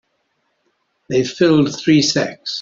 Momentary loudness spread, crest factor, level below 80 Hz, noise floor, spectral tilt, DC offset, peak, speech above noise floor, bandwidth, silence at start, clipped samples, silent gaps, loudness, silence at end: 7 LU; 16 dB; -58 dBFS; -67 dBFS; -5 dB/octave; under 0.1%; -2 dBFS; 52 dB; 7.6 kHz; 1.1 s; under 0.1%; none; -16 LUFS; 0 s